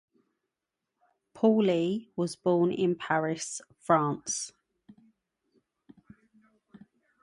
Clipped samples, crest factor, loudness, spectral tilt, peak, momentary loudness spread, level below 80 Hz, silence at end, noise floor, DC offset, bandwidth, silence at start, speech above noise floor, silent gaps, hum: under 0.1%; 22 dB; -28 LUFS; -5 dB/octave; -8 dBFS; 10 LU; -74 dBFS; 2.75 s; -87 dBFS; under 0.1%; 11.5 kHz; 1.35 s; 59 dB; none; none